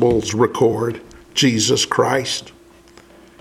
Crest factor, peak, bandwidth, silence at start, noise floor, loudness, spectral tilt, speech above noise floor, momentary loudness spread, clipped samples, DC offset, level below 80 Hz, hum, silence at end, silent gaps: 16 dB; -2 dBFS; 16 kHz; 0 s; -46 dBFS; -18 LUFS; -4 dB/octave; 29 dB; 9 LU; under 0.1%; under 0.1%; -48 dBFS; none; 0.9 s; none